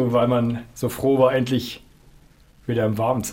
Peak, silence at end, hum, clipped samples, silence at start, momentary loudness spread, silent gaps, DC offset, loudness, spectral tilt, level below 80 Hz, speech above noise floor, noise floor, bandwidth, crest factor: -4 dBFS; 0 s; none; under 0.1%; 0 s; 13 LU; none; under 0.1%; -21 LUFS; -6.5 dB/octave; -50 dBFS; 31 dB; -52 dBFS; 16.5 kHz; 18 dB